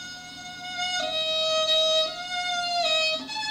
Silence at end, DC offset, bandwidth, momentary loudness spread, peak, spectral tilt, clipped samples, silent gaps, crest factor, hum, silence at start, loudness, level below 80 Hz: 0 s; under 0.1%; 16 kHz; 16 LU; -14 dBFS; 0 dB/octave; under 0.1%; none; 12 dB; none; 0 s; -24 LUFS; -64 dBFS